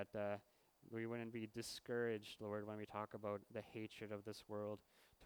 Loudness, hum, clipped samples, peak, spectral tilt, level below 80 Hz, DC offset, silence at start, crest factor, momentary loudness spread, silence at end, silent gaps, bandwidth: -49 LUFS; none; under 0.1%; -32 dBFS; -5.5 dB/octave; -82 dBFS; under 0.1%; 0 s; 18 dB; 8 LU; 0 s; none; over 20 kHz